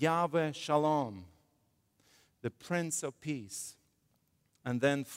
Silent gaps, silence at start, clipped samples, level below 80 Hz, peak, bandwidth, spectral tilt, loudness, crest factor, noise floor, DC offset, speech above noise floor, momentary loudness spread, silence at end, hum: none; 0 s; under 0.1%; -76 dBFS; -16 dBFS; 16 kHz; -5 dB/octave; -34 LUFS; 20 dB; -75 dBFS; under 0.1%; 42 dB; 13 LU; 0 s; none